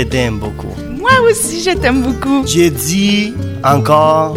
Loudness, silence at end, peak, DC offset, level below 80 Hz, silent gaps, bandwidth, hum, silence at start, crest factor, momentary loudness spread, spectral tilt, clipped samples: -12 LUFS; 0 s; 0 dBFS; 0.2%; -30 dBFS; none; 17 kHz; none; 0 s; 12 dB; 10 LU; -4.5 dB/octave; under 0.1%